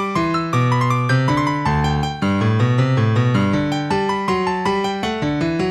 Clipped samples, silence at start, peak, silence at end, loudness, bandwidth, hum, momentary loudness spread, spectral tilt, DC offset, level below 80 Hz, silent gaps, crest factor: under 0.1%; 0 s; -6 dBFS; 0 s; -18 LUFS; 10.5 kHz; none; 4 LU; -7 dB/octave; under 0.1%; -38 dBFS; none; 12 dB